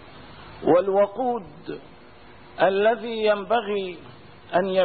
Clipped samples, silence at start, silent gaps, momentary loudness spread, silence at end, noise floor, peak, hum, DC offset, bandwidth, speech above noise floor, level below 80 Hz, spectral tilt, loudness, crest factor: under 0.1%; 0 s; none; 22 LU; 0 s; -48 dBFS; -8 dBFS; none; 0.3%; 4.7 kHz; 26 dB; -58 dBFS; -10 dB/octave; -23 LUFS; 16 dB